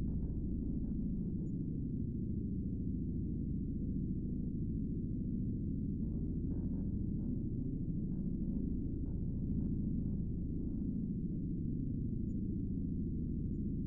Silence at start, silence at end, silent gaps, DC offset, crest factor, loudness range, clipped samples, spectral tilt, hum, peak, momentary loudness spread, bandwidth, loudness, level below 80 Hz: 0 s; 0 s; none; under 0.1%; 12 dB; 0 LU; under 0.1%; -17.5 dB/octave; none; -26 dBFS; 1 LU; 1.2 kHz; -39 LUFS; -44 dBFS